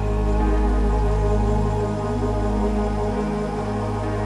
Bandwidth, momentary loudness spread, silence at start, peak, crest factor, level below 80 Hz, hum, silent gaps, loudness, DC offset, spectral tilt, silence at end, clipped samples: 10.5 kHz; 4 LU; 0 s; -10 dBFS; 12 dB; -24 dBFS; none; none; -23 LUFS; under 0.1%; -8 dB/octave; 0 s; under 0.1%